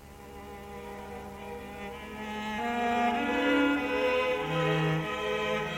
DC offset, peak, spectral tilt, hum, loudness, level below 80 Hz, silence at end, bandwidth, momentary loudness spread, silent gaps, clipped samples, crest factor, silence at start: under 0.1%; -16 dBFS; -5.5 dB/octave; none; -29 LUFS; -54 dBFS; 0 s; 17 kHz; 16 LU; none; under 0.1%; 16 dB; 0 s